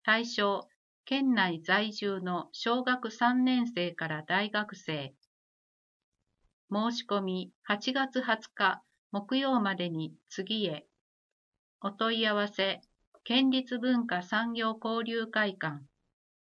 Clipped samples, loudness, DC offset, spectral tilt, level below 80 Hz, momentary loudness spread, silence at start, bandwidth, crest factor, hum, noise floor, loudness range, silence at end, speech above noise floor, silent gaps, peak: under 0.1%; -31 LUFS; under 0.1%; -5 dB/octave; -82 dBFS; 11 LU; 0.05 s; 7.4 kHz; 20 dB; none; under -90 dBFS; 5 LU; 0.7 s; over 59 dB; 0.76-1.04 s, 5.27-6.12 s, 6.53-6.68 s, 7.55-7.62 s, 8.98-9.10 s, 11.01-11.52 s, 11.59-11.80 s, 13.07-13.12 s; -12 dBFS